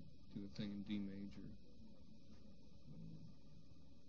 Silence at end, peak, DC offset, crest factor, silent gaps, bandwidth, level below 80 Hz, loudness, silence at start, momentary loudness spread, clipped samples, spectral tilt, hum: 0 s; -34 dBFS; 0.2%; 18 dB; none; 6.8 kHz; -70 dBFS; -52 LUFS; 0 s; 18 LU; under 0.1%; -6.5 dB/octave; none